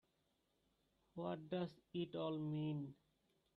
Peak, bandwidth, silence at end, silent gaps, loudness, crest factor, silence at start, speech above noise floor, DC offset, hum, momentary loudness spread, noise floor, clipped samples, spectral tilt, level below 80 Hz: -32 dBFS; 5.8 kHz; 0.65 s; none; -46 LUFS; 16 dB; 1.15 s; 38 dB; under 0.1%; none; 6 LU; -84 dBFS; under 0.1%; -9 dB/octave; -82 dBFS